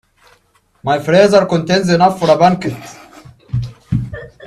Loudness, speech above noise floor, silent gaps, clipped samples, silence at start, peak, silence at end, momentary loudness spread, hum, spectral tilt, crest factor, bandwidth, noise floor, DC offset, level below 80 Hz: -14 LUFS; 44 dB; none; under 0.1%; 0.85 s; 0 dBFS; 0 s; 15 LU; none; -6 dB/octave; 14 dB; 13.5 kHz; -56 dBFS; under 0.1%; -40 dBFS